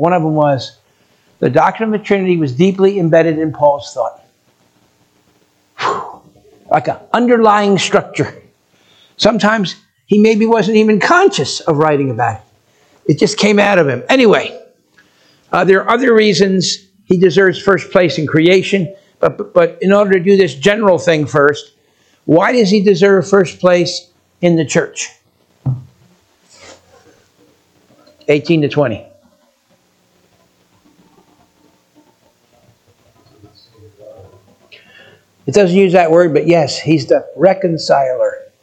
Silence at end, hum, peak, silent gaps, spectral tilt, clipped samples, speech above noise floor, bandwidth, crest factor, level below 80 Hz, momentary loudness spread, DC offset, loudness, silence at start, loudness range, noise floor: 0.2 s; none; 0 dBFS; none; -5.5 dB/octave; under 0.1%; 45 dB; 9 kHz; 14 dB; -54 dBFS; 12 LU; under 0.1%; -12 LUFS; 0 s; 8 LU; -56 dBFS